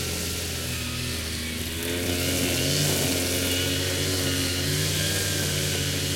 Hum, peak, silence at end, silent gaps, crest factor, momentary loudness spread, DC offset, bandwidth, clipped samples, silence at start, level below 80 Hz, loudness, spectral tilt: none; -10 dBFS; 0 s; none; 16 dB; 6 LU; under 0.1%; 17 kHz; under 0.1%; 0 s; -46 dBFS; -25 LUFS; -3 dB/octave